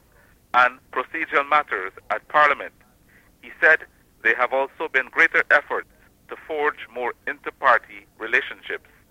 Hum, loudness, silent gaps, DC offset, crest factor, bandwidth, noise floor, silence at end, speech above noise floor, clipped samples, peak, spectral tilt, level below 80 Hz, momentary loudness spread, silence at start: none; -21 LUFS; none; under 0.1%; 20 dB; 16 kHz; -56 dBFS; 0.35 s; 34 dB; under 0.1%; -4 dBFS; -3.5 dB/octave; -62 dBFS; 14 LU; 0.55 s